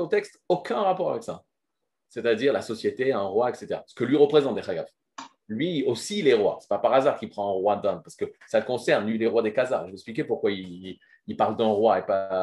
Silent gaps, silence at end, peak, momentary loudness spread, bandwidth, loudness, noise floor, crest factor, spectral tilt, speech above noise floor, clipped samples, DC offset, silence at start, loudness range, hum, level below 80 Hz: none; 0 s; -6 dBFS; 16 LU; 12 kHz; -25 LUFS; -83 dBFS; 20 dB; -5.5 dB/octave; 59 dB; under 0.1%; under 0.1%; 0 s; 2 LU; none; -72 dBFS